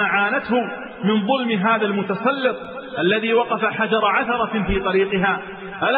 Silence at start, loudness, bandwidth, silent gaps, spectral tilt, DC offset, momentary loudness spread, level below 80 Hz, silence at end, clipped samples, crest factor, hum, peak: 0 s; -20 LUFS; 4.9 kHz; none; -10 dB/octave; under 0.1%; 6 LU; -42 dBFS; 0 s; under 0.1%; 14 dB; none; -6 dBFS